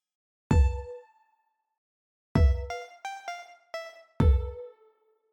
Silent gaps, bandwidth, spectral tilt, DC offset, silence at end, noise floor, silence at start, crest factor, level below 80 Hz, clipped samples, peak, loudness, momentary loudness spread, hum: 1.78-2.35 s; 8.2 kHz; -7.5 dB/octave; under 0.1%; 0.65 s; -74 dBFS; 0.5 s; 20 dB; -32 dBFS; under 0.1%; -8 dBFS; -28 LUFS; 20 LU; none